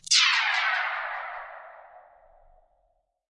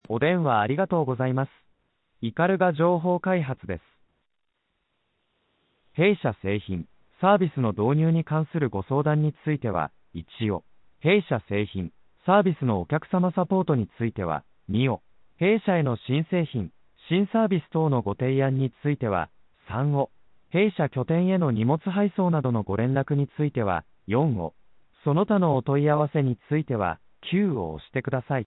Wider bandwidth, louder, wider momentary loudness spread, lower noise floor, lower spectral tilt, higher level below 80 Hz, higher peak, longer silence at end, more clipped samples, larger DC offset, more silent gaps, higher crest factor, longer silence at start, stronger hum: first, 11.5 kHz vs 4.1 kHz; about the same, -23 LUFS vs -25 LUFS; first, 22 LU vs 10 LU; second, -72 dBFS vs -76 dBFS; second, 5 dB/octave vs -12 dB/octave; second, -68 dBFS vs -56 dBFS; about the same, -8 dBFS vs -6 dBFS; first, 1.3 s vs 0 s; neither; neither; neither; about the same, 22 dB vs 18 dB; about the same, 0.1 s vs 0.1 s; neither